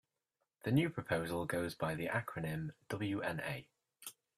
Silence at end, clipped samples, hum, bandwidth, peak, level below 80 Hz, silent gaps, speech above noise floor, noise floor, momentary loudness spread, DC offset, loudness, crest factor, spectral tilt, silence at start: 0.25 s; under 0.1%; none; 15 kHz; -20 dBFS; -68 dBFS; none; 49 dB; -87 dBFS; 12 LU; under 0.1%; -39 LUFS; 20 dB; -6 dB/octave; 0.65 s